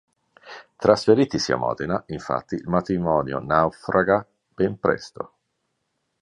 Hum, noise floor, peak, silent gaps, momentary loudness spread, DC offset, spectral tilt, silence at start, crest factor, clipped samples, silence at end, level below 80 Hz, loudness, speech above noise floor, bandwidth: none; -75 dBFS; -2 dBFS; none; 17 LU; under 0.1%; -6 dB/octave; 0.45 s; 22 dB; under 0.1%; 0.95 s; -52 dBFS; -22 LUFS; 53 dB; 10.5 kHz